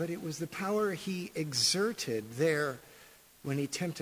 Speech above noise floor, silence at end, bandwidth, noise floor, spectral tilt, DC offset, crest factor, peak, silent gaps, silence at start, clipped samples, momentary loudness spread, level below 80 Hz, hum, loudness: 25 dB; 0 s; 16 kHz; -58 dBFS; -3.5 dB/octave; under 0.1%; 18 dB; -16 dBFS; none; 0 s; under 0.1%; 10 LU; -72 dBFS; none; -32 LUFS